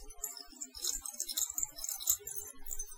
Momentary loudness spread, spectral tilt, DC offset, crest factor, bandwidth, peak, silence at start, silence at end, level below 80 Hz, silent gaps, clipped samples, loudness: 10 LU; 1 dB/octave; under 0.1%; 30 dB; 18 kHz; -10 dBFS; 0 s; 0 s; -54 dBFS; none; under 0.1%; -36 LUFS